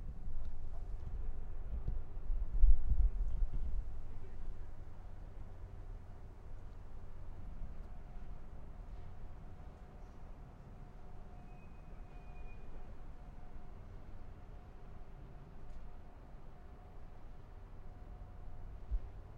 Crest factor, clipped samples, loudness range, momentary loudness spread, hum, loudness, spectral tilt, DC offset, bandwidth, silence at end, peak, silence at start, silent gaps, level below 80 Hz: 24 dB; under 0.1%; 15 LU; 14 LU; none; -48 LUFS; -8.5 dB/octave; under 0.1%; 2.6 kHz; 0 s; -14 dBFS; 0 s; none; -40 dBFS